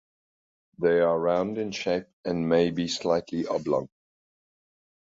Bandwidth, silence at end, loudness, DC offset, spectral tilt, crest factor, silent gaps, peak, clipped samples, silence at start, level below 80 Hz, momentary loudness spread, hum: 8 kHz; 1.25 s; -26 LUFS; under 0.1%; -5.5 dB/octave; 18 dB; 2.13-2.23 s; -10 dBFS; under 0.1%; 0.8 s; -60 dBFS; 7 LU; none